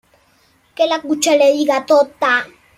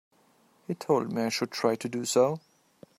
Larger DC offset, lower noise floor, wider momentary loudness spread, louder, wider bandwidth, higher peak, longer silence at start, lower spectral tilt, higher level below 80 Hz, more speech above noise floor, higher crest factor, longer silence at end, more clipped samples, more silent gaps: neither; second, -56 dBFS vs -64 dBFS; second, 6 LU vs 13 LU; first, -15 LUFS vs -28 LUFS; about the same, 15 kHz vs 16 kHz; first, -2 dBFS vs -10 dBFS; about the same, 0.8 s vs 0.7 s; second, -1.5 dB/octave vs -4.5 dB/octave; first, -64 dBFS vs -74 dBFS; first, 41 dB vs 37 dB; second, 14 dB vs 20 dB; second, 0.3 s vs 0.6 s; neither; neither